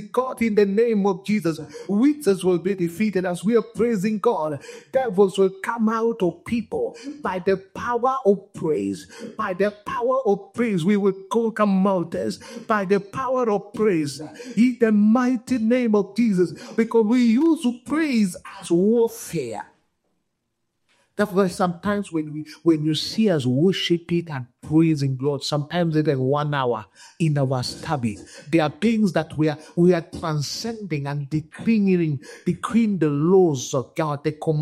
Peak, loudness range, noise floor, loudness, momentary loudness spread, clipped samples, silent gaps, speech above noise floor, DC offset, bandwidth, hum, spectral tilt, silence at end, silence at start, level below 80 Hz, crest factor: -6 dBFS; 4 LU; -76 dBFS; -22 LUFS; 9 LU; under 0.1%; none; 54 dB; under 0.1%; 14 kHz; none; -6.5 dB/octave; 0 s; 0 s; -62 dBFS; 16 dB